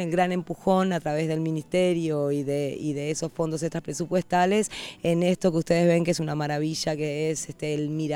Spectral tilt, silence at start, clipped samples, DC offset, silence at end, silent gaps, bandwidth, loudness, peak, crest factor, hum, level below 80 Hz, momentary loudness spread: -5.5 dB/octave; 0 s; under 0.1%; under 0.1%; 0 s; none; 16.5 kHz; -26 LUFS; -8 dBFS; 16 dB; none; -58 dBFS; 7 LU